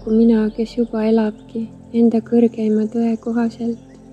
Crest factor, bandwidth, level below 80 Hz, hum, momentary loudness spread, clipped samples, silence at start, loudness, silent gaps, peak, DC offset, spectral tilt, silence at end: 14 dB; 7.8 kHz; -48 dBFS; none; 12 LU; under 0.1%; 0 s; -18 LUFS; none; -4 dBFS; under 0.1%; -8.5 dB/octave; 0.35 s